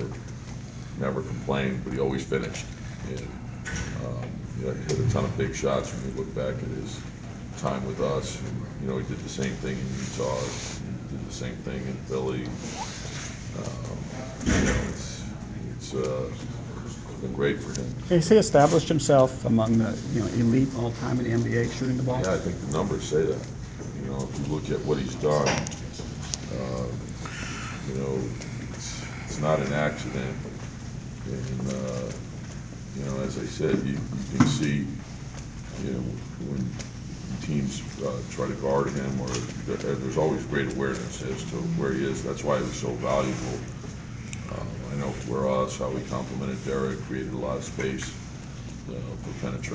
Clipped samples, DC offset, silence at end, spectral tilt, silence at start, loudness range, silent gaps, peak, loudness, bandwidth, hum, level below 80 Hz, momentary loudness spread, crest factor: under 0.1%; under 0.1%; 0 s; -6 dB/octave; 0 s; 9 LU; none; -6 dBFS; -29 LUFS; 8 kHz; none; -44 dBFS; 13 LU; 22 dB